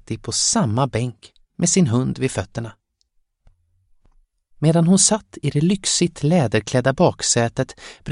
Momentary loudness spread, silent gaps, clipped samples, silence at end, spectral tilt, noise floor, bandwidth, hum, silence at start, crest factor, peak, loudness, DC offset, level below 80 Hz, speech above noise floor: 12 LU; none; under 0.1%; 0 s; -4.5 dB/octave; -66 dBFS; 11.5 kHz; none; 0.1 s; 18 dB; -2 dBFS; -19 LUFS; under 0.1%; -50 dBFS; 47 dB